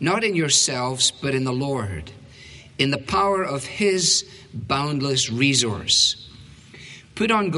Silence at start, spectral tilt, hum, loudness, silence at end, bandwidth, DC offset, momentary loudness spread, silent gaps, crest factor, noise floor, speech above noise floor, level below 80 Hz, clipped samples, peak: 0 s; -3 dB/octave; none; -20 LUFS; 0 s; 11.5 kHz; under 0.1%; 19 LU; none; 18 dB; -44 dBFS; 23 dB; -50 dBFS; under 0.1%; -4 dBFS